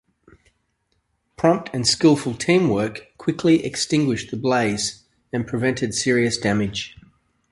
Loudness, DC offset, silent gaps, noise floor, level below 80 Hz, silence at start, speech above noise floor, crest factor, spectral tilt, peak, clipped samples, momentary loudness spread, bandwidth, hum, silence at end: -21 LUFS; under 0.1%; none; -70 dBFS; -52 dBFS; 1.4 s; 50 dB; 18 dB; -4.5 dB/octave; -2 dBFS; under 0.1%; 10 LU; 11.5 kHz; none; 0.65 s